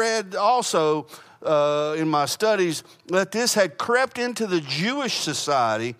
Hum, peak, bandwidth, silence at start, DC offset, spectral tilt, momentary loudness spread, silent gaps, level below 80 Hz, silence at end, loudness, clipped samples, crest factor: none; -8 dBFS; 15.5 kHz; 0 s; under 0.1%; -3.5 dB/octave; 5 LU; none; -74 dBFS; 0.05 s; -22 LUFS; under 0.1%; 16 dB